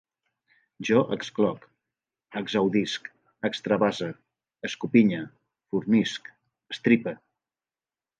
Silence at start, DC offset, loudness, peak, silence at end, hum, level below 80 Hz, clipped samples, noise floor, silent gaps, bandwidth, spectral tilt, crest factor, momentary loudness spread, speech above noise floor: 0.8 s; under 0.1%; -26 LUFS; -6 dBFS; 1.05 s; none; -70 dBFS; under 0.1%; under -90 dBFS; none; 8.8 kHz; -6 dB/octave; 22 dB; 15 LU; over 65 dB